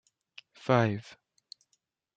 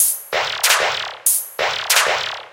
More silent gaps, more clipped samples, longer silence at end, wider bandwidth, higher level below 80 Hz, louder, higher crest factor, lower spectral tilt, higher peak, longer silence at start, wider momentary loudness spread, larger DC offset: neither; neither; first, 1.15 s vs 0.05 s; second, 8 kHz vs 17 kHz; second, -72 dBFS vs -60 dBFS; second, -29 LUFS vs -17 LUFS; about the same, 24 dB vs 20 dB; first, -7 dB/octave vs 2 dB/octave; second, -10 dBFS vs 0 dBFS; first, 0.65 s vs 0 s; first, 26 LU vs 6 LU; neither